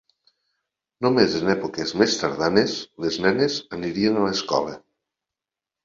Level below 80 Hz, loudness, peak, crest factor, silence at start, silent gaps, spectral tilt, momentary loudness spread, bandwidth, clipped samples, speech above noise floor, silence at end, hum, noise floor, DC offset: -58 dBFS; -22 LUFS; -2 dBFS; 22 dB; 1 s; none; -4.5 dB/octave; 8 LU; 7.6 kHz; under 0.1%; 67 dB; 1.05 s; none; -89 dBFS; under 0.1%